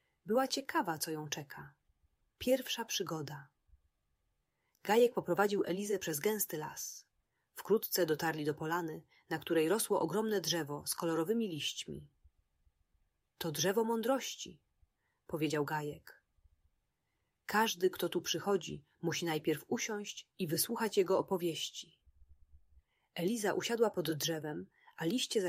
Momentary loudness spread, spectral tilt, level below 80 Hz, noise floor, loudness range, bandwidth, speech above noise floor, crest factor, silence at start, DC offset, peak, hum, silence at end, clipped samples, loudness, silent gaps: 14 LU; -3.5 dB/octave; -72 dBFS; -84 dBFS; 4 LU; 16 kHz; 48 dB; 20 dB; 0.25 s; under 0.1%; -16 dBFS; none; 0 s; under 0.1%; -35 LUFS; none